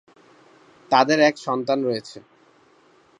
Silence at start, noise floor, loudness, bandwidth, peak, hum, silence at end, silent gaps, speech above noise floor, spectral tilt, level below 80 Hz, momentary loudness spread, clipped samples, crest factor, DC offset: 0.9 s; -56 dBFS; -20 LUFS; 11 kHz; -2 dBFS; none; 1 s; none; 36 dB; -4.5 dB/octave; -76 dBFS; 12 LU; under 0.1%; 22 dB; under 0.1%